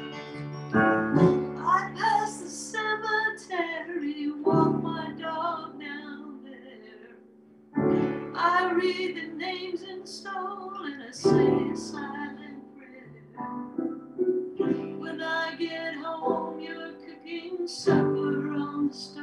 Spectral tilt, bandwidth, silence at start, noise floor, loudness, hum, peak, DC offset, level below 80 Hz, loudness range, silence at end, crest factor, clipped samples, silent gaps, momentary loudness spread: -6 dB/octave; 11.5 kHz; 0 s; -54 dBFS; -28 LUFS; none; -8 dBFS; under 0.1%; -64 dBFS; 6 LU; 0 s; 20 dB; under 0.1%; none; 17 LU